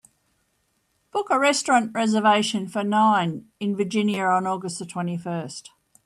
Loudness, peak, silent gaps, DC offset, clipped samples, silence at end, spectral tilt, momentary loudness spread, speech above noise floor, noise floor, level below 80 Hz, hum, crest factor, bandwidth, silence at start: -23 LUFS; -6 dBFS; none; under 0.1%; under 0.1%; 0.45 s; -4.5 dB/octave; 12 LU; 48 dB; -70 dBFS; -72 dBFS; none; 18 dB; 12.5 kHz; 1.15 s